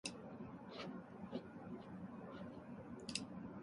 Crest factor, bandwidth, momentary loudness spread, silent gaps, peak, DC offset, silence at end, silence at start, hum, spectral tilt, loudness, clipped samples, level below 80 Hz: 26 dB; 11 kHz; 7 LU; none; -24 dBFS; under 0.1%; 0 s; 0.05 s; none; -4 dB/octave; -51 LUFS; under 0.1%; -74 dBFS